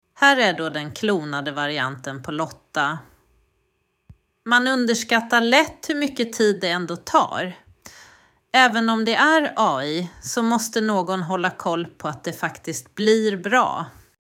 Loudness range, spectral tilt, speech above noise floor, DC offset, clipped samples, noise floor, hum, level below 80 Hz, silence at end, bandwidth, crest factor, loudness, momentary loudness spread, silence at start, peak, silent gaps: 6 LU; -3.5 dB/octave; 49 dB; under 0.1%; under 0.1%; -70 dBFS; none; -62 dBFS; 0.3 s; 16.5 kHz; 20 dB; -21 LUFS; 12 LU; 0.2 s; -2 dBFS; none